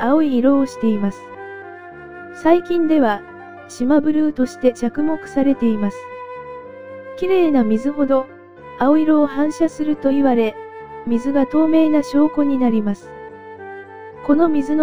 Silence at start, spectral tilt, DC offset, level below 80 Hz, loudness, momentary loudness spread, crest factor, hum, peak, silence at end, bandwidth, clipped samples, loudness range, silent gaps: 0 s; -7 dB/octave; 2%; -48 dBFS; -17 LUFS; 20 LU; 16 dB; none; 0 dBFS; 0 s; 11 kHz; under 0.1%; 3 LU; none